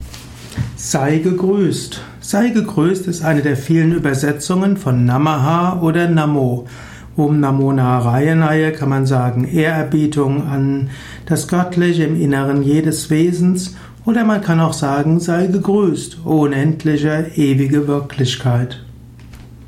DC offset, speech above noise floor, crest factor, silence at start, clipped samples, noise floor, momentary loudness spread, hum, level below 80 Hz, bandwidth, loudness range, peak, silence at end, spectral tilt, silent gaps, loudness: under 0.1%; 22 dB; 12 dB; 0 s; under 0.1%; -37 dBFS; 9 LU; none; -44 dBFS; 15.5 kHz; 2 LU; -4 dBFS; 0 s; -6.5 dB/octave; none; -16 LUFS